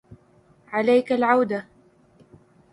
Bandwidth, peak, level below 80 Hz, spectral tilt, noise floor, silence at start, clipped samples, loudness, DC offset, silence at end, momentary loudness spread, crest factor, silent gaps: 11 kHz; -6 dBFS; -66 dBFS; -6.5 dB/octave; -57 dBFS; 0.7 s; under 0.1%; -22 LUFS; under 0.1%; 1.1 s; 10 LU; 20 dB; none